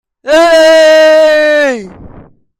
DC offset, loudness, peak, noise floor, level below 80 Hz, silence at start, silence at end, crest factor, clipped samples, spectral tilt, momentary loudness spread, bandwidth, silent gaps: under 0.1%; -6 LUFS; 0 dBFS; -36 dBFS; -44 dBFS; 0.25 s; 0.55 s; 8 dB; under 0.1%; -2.5 dB/octave; 8 LU; 14.5 kHz; none